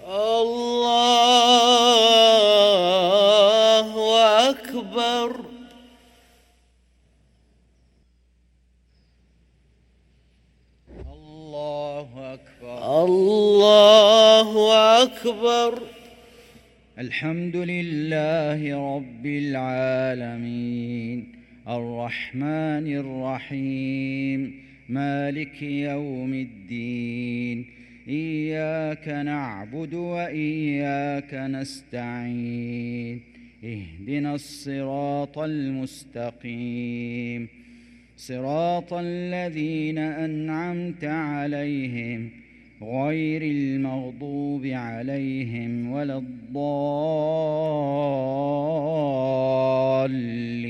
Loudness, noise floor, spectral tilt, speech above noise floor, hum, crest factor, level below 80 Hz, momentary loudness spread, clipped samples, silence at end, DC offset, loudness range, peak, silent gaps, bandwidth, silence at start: -22 LUFS; -61 dBFS; -4.5 dB/octave; 34 dB; none; 22 dB; -58 dBFS; 18 LU; under 0.1%; 0 s; under 0.1%; 15 LU; 0 dBFS; none; 16.5 kHz; 0 s